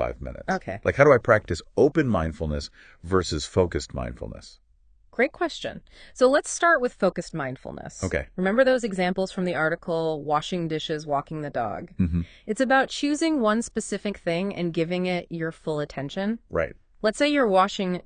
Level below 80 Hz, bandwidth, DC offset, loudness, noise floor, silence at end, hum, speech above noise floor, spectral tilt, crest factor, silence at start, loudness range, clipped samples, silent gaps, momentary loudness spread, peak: -46 dBFS; 10 kHz; under 0.1%; -25 LUFS; -59 dBFS; 0.05 s; none; 34 dB; -5.5 dB/octave; 22 dB; 0 s; 5 LU; under 0.1%; none; 12 LU; -2 dBFS